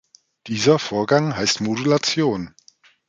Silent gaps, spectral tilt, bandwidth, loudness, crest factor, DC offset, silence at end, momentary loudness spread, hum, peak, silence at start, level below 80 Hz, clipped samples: none; -4.5 dB/octave; 9.4 kHz; -20 LUFS; 18 dB; under 0.1%; 0.6 s; 10 LU; none; -2 dBFS; 0.45 s; -56 dBFS; under 0.1%